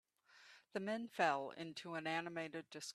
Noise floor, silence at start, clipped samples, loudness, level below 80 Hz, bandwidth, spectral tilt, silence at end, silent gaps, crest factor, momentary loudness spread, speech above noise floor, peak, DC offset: -67 dBFS; 0.35 s; under 0.1%; -43 LUFS; -90 dBFS; 13.5 kHz; -4 dB/octave; 0 s; none; 24 dB; 12 LU; 24 dB; -20 dBFS; under 0.1%